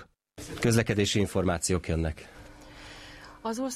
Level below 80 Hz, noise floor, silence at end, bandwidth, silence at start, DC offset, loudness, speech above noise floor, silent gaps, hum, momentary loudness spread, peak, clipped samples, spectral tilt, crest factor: -46 dBFS; -48 dBFS; 0 s; 14.5 kHz; 0 s; under 0.1%; -28 LUFS; 20 dB; none; none; 22 LU; -12 dBFS; under 0.1%; -5 dB/octave; 18 dB